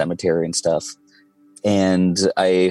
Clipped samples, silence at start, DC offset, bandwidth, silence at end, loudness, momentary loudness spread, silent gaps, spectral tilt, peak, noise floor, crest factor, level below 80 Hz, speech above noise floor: under 0.1%; 0 s; under 0.1%; 12 kHz; 0 s; -19 LUFS; 8 LU; none; -5 dB/octave; -6 dBFS; -54 dBFS; 12 dB; -58 dBFS; 36 dB